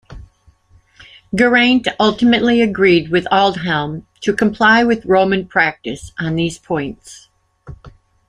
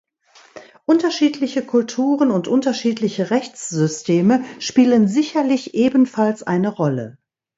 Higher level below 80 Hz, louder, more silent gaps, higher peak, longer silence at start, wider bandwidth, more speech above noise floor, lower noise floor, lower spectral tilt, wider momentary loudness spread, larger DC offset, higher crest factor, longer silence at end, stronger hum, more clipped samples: first, -46 dBFS vs -64 dBFS; first, -15 LUFS vs -18 LUFS; neither; about the same, -2 dBFS vs -2 dBFS; second, 0.1 s vs 0.55 s; first, 10.5 kHz vs 8 kHz; about the same, 37 dB vs 34 dB; about the same, -51 dBFS vs -51 dBFS; about the same, -5.5 dB/octave vs -6 dB/octave; first, 13 LU vs 6 LU; neither; about the same, 16 dB vs 16 dB; about the same, 0.4 s vs 0.45 s; neither; neither